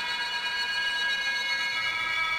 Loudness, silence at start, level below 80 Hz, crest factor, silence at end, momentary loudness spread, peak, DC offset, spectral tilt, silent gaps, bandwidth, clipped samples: -27 LUFS; 0 s; -62 dBFS; 14 dB; 0 s; 2 LU; -16 dBFS; under 0.1%; 0.5 dB/octave; none; 17.5 kHz; under 0.1%